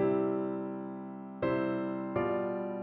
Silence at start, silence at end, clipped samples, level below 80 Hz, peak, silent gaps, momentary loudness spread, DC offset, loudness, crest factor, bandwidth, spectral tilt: 0 s; 0 s; under 0.1%; -66 dBFS; -18 dBFS; none; 10 LU; under 0.1%; -34 LUFS; 14 dB; 4.5 kHz; -7 dB/octave